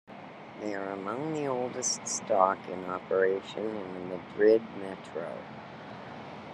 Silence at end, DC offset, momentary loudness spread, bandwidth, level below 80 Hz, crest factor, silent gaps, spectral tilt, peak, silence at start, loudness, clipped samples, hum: 0 s; under 0.1%; 18 LU; 11 kHz; -76 dBFS; 24 dB; none; -3.5 dB/octave; -8 dBFS; 0.1 s; -31 LUFS; under 0.1%; none